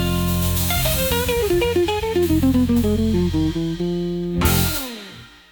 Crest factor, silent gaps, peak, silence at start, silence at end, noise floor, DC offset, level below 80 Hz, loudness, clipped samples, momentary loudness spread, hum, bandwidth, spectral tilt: 16 dB; none; -4 dBFS; 0 s; 0.25 s; -40 dBFS; under 0.1%; -32 dBFS; -19 LUFS; under 0.1%; 7 LU; none; 19.5 kHz; -5 dB/octave